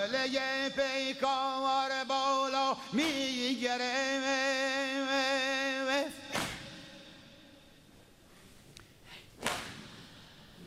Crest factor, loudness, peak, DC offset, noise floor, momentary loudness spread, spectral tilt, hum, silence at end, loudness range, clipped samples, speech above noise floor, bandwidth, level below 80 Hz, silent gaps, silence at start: 24 dB; -32 LUFS; -12 dBFS; under 0.1%; -59 dBFS; 20 LU; -2.5 dB/octave; none; 0 s; 14 LU; under 0.1%; 27 dB; 16 kHz; -66 dBFS; none; 0 s